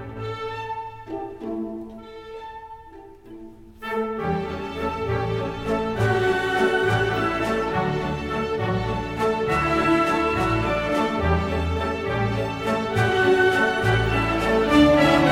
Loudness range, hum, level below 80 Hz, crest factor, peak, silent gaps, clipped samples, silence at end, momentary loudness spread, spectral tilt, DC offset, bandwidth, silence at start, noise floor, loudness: 12 LU; none; -40 dBFS; 18 dB; -4 dBFS; none; under 0.1%; 0 s; 17 LU; -6.5 dB/octave; under 0.1%; 16 kHz; 0 s; -44 dBFS; -22 LUFS